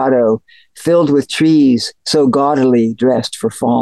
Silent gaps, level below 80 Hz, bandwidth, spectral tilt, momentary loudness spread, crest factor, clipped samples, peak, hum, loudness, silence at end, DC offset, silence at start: none; -58 dBFS; 12.5 kHz; -5.5 dB/octave; 7 LU; 10 dB; under 0.1%; -4 dBFS; none; -13 LUFS; 0 s; 0.2%; 0 s